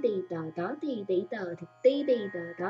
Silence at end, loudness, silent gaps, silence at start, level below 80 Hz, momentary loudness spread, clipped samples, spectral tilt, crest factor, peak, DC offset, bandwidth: 0 s; -31 LUFS; none; 0 s; -84 dBFS; 10 LU; under 0.1%; -7.5 dB/octave; 18 dB; -12 dBFS; under 0.1%; 7.2 kHz